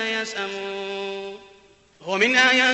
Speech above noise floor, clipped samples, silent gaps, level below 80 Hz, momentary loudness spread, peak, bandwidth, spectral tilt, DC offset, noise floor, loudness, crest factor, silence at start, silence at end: 31 dB; under 0.1%; none; -66 dBFS; 22 LU; -4 dBFS; 8.4 kHz; -2 dB/octave; under 0.1%; -54 dBFS; -21 LUFS; 20 dB; 0 s; 0 s